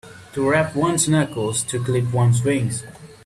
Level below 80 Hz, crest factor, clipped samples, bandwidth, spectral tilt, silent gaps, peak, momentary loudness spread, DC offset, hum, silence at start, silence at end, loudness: -52 dBFS; 14 dB; under 0.1%; 13.5 kHz; -5 dB/octave; none; -6 dBFS; 9 LU; under 0.1%; none; 0.05 s; 0.1 s; -20 LUFS